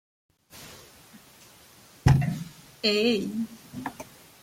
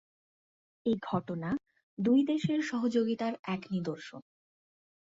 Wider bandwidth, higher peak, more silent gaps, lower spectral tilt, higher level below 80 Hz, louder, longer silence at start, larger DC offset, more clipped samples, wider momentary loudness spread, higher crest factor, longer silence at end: first, 16.5 kHz vs 7.8 kHz; first, -6 dBFS vs -16 dBFS; second, none vs 1.83-1.97 s, 3.39-3.44 s; about the same, -6 dB/octave vs -7 dB/octave; first, -46 dBFS vs -70 dBFS; first, -27 LUFS vs -32 LUFS; second, 0.55 s vs 0.85 s; neither; neither; first, 23 LU vs 13 LU; first, 24 dB vs 16 dB; second, 0.4 s vs 0.85 s